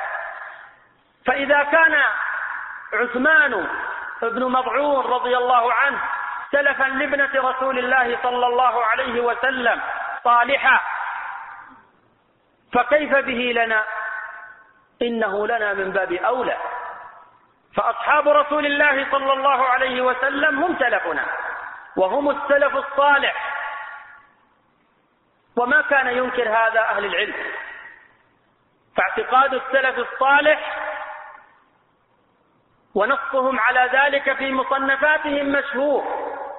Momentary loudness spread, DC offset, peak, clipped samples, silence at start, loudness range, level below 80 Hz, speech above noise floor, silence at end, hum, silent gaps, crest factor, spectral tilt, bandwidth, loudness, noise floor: 13 LU; under 0.1%; -4 dBFS; under 0.1%; 0 s; 4 LU; -58 dBFS; 44 dB; 0 s; none; none; 18 dB; 0 dB/octave; 4.1 kHz; -19 LUFS; -63 dBFS